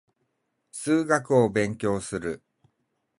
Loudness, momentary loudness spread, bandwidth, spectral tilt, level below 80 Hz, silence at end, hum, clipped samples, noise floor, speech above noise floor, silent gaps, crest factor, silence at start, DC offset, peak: -25 LUFS; 14 LU; 11.5 kHz; -6 dB/octave; -58 dBFS; 0.85 s; none; under 0.1%; -76 dBFS; 52 dB; none; 20 dB; 0.75 s; under 0.1%; -6 dBFS